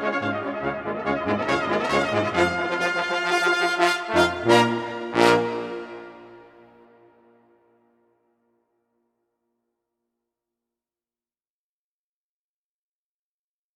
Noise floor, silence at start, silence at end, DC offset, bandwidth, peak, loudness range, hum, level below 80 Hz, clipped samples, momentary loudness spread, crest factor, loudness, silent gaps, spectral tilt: under -90 dBFS; 0 s; 7.3 s; under 0.1%; 15 kHz; -2 dBFS; 6 LU; none; -58 dBFS; under 0.1%; 10 LU; 24 dB; -22 LUFS; none; -4.5 dB/octave